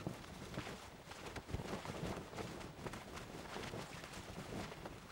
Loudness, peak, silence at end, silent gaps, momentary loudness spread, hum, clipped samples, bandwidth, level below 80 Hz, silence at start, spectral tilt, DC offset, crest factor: -49 LUFS; -28 dBFS; 0 s; none; 5 LU; none; under 0.1%; over 20 kHz; -60 dBFS; 0 s; -5 dB/octave; under 0.1%; 20 dB